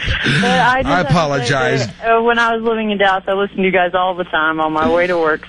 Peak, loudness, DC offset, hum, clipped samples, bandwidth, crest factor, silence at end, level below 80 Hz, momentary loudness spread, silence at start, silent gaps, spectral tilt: -4 dBFS; -15 LUFS; under 0.1%; none; under 0.1%; 11 kHz; 12 dB; 0 s; -36 dBFS; 5 LU; 0 s; none; -5 dB/octave